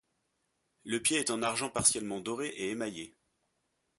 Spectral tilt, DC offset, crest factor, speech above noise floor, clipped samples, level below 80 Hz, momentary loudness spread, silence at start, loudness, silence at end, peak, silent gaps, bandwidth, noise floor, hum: -2 dB/octave; under 0.1%; 26 dB; 47 dB; under 0.1%; -66 dBFS; 15 LU; 0.85 s; -31 LUFS; 0.9 s; -10 dBFS; none; 12 kHz; -79 dBFS; none